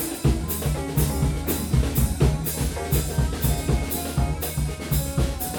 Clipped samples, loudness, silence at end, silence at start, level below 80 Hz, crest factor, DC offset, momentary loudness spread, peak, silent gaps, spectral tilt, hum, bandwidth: under 0.1%; -24 LUFS; 0 s; 0 s; -28 dBFS; 16 dB; under 0.1%; 4 LU; -6 dBFS; none; -5.5 dB/octave; none; over 20 kHz